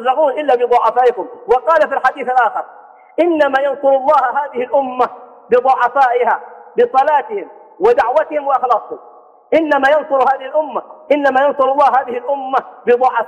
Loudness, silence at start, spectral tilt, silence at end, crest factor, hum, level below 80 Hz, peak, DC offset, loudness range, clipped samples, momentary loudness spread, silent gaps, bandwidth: -14 LUFS; 0 s; -5 dB/octave; 0 s; 12 dB; none; -58 dBFS; -2 dBFS; under 0.1%; 1 LU; under 0.1%; 9 LU; none; 9 kHz